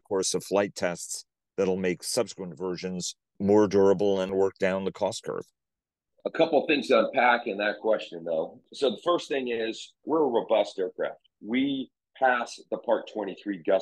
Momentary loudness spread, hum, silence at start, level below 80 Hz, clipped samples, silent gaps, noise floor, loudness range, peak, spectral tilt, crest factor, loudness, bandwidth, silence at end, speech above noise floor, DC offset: 12 LU; none; 0.1 s; -72 dBFS; under 0.1%; none; -89 dBFS; 3 LU; -10 dBFS; -4 dB/octave; 18 dB; -27 LUFS; 12.5 kHz; 0 s; 63 dB; under 0.1%